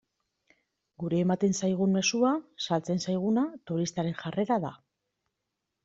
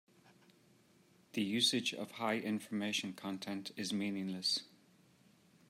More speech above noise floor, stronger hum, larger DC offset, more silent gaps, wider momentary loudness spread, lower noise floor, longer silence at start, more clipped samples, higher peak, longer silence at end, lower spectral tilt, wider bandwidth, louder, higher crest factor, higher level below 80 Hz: first, 56 dB vs 30 dB; neither; neither; neither; second, 7 LU vs 11 LU; first, -84 dBFS vs -68 dBFS; second, 1 s vs 1.35 s; neither; first, -12 dBFS vs -20 dBFS; about the same, 1.1 s vs 1.05 s; first, -5.5 dB/octave vs -3 dB/octave; second, 7.8 kHz vs 16 kHz; first, -29 LUFS vs -37 LUFS; about the same, 18 dB vs 22 dB; first, -70 dBFS vs -86 dBFS